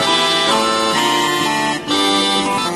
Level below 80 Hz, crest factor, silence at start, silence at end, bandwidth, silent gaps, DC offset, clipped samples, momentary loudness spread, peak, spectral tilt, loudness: -52 dBFS; 14 dB; 0 s; 0 s; 13.5 kHz; none; under 0.1%; under 0.1%; 3 LU; -2 dBFS; -2 dB/octave; -14 LUFS